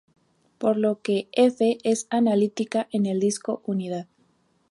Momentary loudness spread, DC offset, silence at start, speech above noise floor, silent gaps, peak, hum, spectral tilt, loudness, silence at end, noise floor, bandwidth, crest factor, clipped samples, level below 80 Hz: 8 LU; under 0.1%; 0.6 s; 42 dB; none; -8 dBFS; none; -5.5 dB/octave; -24 LUFS; 0.65 s; -65 dBFS; 11.5 kHz; 18 dB; under 0.1%; -74 dBFS